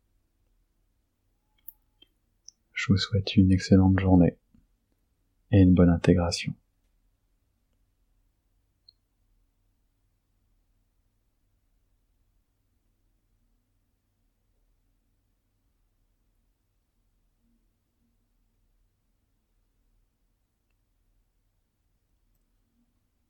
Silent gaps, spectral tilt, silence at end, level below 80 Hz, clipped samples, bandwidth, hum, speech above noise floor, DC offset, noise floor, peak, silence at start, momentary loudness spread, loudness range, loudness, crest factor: none; -7 dB/octave; 16.75 s; -52 dBFS; under 0.1%; 16.5 kHz; none; 52 dB; under 0.1%; -73 dBFS; -6 dBFS; 2.75 s; 12 LU; 10 LU; -22 LUFS; 24 dB